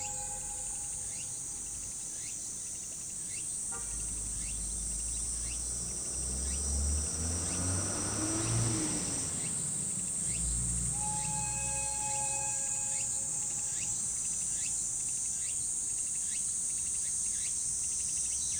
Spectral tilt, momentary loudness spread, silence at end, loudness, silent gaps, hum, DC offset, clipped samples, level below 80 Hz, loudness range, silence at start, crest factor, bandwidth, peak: -2.5 dB/octave; 6 LU; 0 s; -32 LUFS; none; none; under 0.1%; under 0.1%; -46 dBFS; 5 LU; 0 s; 16 dB; over 20 kHz; -18 dBFS